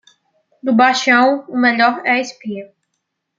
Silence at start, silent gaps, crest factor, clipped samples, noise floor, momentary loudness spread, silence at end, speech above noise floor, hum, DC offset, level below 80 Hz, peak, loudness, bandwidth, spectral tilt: 0.65 s; none; 16 dB; under 0.1%; -74 dBFS; 16 LU; 0.75 s; 59 dB; none; under 0.1%; -70 dBFS; -2 dBFS; -14 LUFS; 7.6 kHz; -3.5 dB/octave